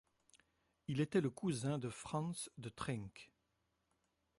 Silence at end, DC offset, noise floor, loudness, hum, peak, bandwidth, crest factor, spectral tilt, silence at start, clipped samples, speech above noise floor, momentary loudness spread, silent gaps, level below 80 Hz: 1.15 s; under 0.1%; -84 dBFS; -42 LUFS; none; -24 dBFS; 11.5 kHz; 20 dB; -6 dB/octave; 0.9 s; under 0.1%; 43 dB; 13 LU; none; -72 dBFS